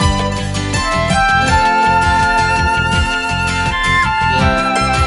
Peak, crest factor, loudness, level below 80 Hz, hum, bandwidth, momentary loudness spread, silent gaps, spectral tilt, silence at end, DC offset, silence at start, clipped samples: -2 dBFS; 12 dB; -13 LUFS; -24 dBFS; none; 11.5 kHz; 5 LU; none; -4 dB/octave; 0 s; under 0.1%; 0 s; under 0.1%